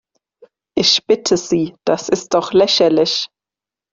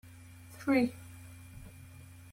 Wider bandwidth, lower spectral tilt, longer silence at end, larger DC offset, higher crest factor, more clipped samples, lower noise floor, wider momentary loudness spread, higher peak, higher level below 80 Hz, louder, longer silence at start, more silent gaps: second, 7.6 kHz vs 16.5 kHz; second, -3.5 dB/octave vs -6 dB/octave; first, 0.65 s vs 0.3 s; neither; about the same, 16 dB vs 20 dB; neither; first, -88 dBFS vs -52 dBFS; second, 8 LU vs 23 LU; first, -2 dBFS vs -18 dBFS; first, -56 dBFS vs -62 dBFS; first, -15 LUFS vs -32 LUFS; first, 0.75 s vs 0.5 s; neither